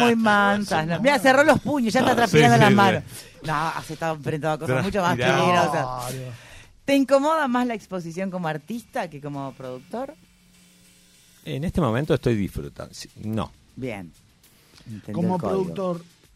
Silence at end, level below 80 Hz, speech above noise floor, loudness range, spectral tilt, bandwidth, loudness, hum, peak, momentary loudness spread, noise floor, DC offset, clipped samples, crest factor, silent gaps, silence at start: 0.35 s; -48 dBFS; 34 dB; 13 LU; -5.5 dB/octave; 15.5 kHz; -22 LUFS; none; -6 dBFS; 19 LU; -56 dBFS; under 0.1%; under 0.1%; 18 dB; none; 0 s